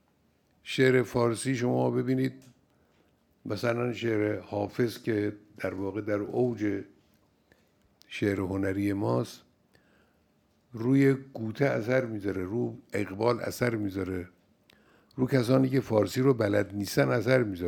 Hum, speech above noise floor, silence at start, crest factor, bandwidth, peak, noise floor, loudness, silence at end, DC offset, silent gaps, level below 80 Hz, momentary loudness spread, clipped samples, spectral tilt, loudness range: none; 41 dB; 0.65 s; 20 dB; 19 kHz; -10 dBFS; -68 dBFS; -29 LUFS; 0 s; under 0.1%; none; -66 dBFS; 11 LU; under 0.1%; -6.5 dB/octave; 5 LU